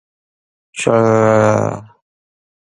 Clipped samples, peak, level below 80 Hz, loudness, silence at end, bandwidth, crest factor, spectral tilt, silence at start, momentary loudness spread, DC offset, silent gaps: under 0.1%; 0 dBFS; -52 dBFS; -14 LUFS; 0.85 s; 11 kHz; 16 dB; -6.5 dB/octave; 0.75 s; 17 LU; under 0.1%; none